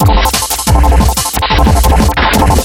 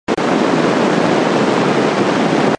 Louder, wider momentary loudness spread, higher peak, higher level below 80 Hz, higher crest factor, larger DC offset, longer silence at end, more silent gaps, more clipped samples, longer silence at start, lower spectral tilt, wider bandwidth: first, -10 LUFS vs -14 LUFS; about the same, 3 LU vs 1 LU; about the same, 0 dBFS vs 0 dBFS; first, -12 dBFS vs -54 dBFS; second, 8 dB vs 14 dB; neither; about the same, 0 s vs 0.05 s; neither; first, 0.1% vs under 0.1%; about the same, 0 s vs 0.1 s; about the same, -4.5 dB/octave vs -5.5 dB/octave; first, 17.5 kHz vs 11 kHz